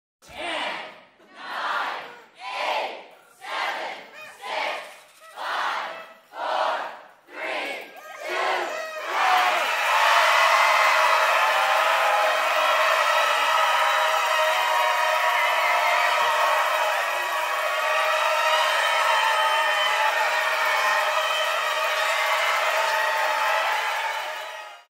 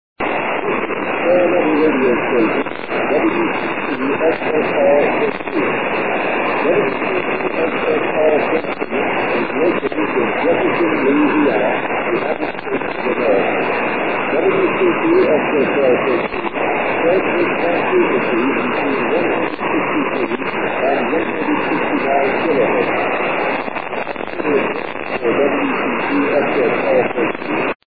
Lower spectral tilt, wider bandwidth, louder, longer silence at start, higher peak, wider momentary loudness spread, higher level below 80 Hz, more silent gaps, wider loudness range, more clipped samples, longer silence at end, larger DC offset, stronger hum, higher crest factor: second, 1.5 dB/octave vs -9 dB/octave; first, 16 kHz vs 4.9 kHz; second, -21 LUFS vs -17 LUFS; first, 0.3 s vs 0.15 s; second, -6 dBFS vs -2 dBFS; first, 16 LU vs 5 LU; second, -78 dBFS vs -52 dBFS; second, none vs 27.75-27.80 s; first, 11 LU vs 2 LU; neither; first, 0.15 s vs 0 s; second, under 0.1% vs 2%; neither; about the same, 18 dB vs 14 dB